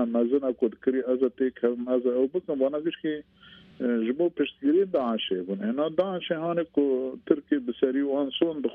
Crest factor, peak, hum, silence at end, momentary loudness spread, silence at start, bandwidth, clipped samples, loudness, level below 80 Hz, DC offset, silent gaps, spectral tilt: 20 dB; -6 dBFS; none; 0 s; 5 LU; 0 s; 4.1 kHz; under 0.1%; -27 LUFS; -70 dBFS; under 0.1%; none; -9 dB/octave